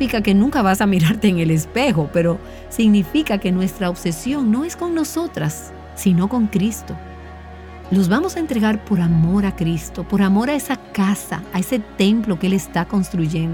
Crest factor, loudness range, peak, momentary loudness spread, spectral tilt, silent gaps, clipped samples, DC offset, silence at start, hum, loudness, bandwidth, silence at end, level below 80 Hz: 14 dB; 4 LU; -4 dBFS; 10 LU; -6 dB/octave; none; under 0.1%; under 0.1%; 0 s; none; -19 LUFS; 18.5 kHz; 0 s; -38 dBFS